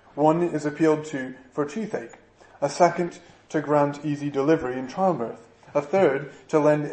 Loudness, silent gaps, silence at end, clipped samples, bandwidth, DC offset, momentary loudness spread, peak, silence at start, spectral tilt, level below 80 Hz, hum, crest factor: -24 LUFS; none; 0 s; under 0.1%; 8.8 kHz; under 0.1%; 11 LU; -4 dBFS; 0.15 s; -6.5 dB/octave; -64 dBFS; none; 20 dB